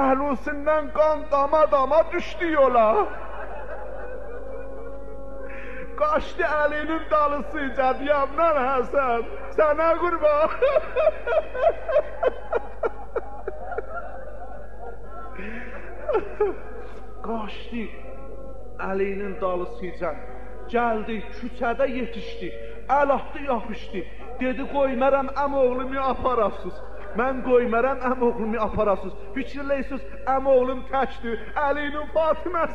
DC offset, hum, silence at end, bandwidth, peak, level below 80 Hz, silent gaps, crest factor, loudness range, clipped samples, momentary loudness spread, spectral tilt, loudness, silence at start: 3%; none; 0 s; 7.4 kHz; -8 dBFS; -42 dBFS; none; 16 dB; 9 LU; under 0.1%; 17 LU; -7 dB/octave; -24 LUFS; 0 s